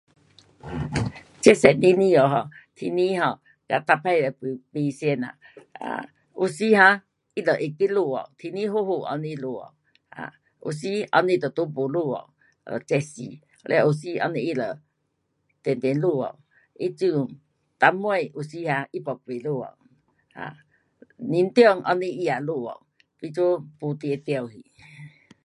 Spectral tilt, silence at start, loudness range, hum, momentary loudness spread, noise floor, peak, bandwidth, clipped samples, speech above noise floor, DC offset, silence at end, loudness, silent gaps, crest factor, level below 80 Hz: -6 dB/octave; 0.65 s; 7 LU; none; 20 LU; -74 dBFS; 0 dBFS; 11.5 kHz; under 0.1%; 51 dB; under 0.1%; 0.35 s; -23 LUFS; none; 24 dB; -58 dBFS